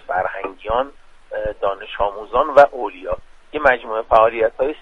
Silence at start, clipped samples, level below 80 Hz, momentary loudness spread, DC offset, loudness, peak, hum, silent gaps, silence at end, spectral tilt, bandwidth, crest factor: 0.1 s; under 0.1%; -42 dBFS; 15 LU; under 0.1%; -18 LUFS; 0 dBFS; none; none; 0.05 s; -5.5 dB/octave; 7.2 kHz; 18 dB